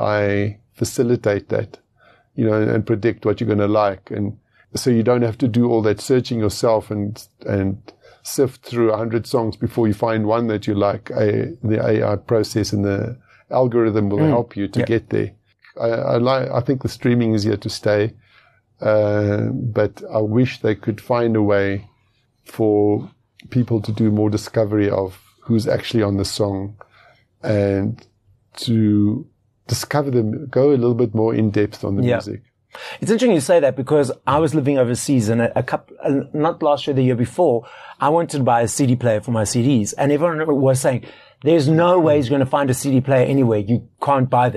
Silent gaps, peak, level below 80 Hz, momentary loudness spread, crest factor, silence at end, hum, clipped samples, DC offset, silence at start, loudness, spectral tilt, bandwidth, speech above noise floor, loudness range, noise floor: none; -4 dBFS; -54 dBFS; 9 LU; 14 dB; 0 s; none; under 0.1%; under 0.1%; 0 s; -19 LUFS; -6.5 dB/octave; 13 kHz; 44 dB; 4 LU; -62 dBFS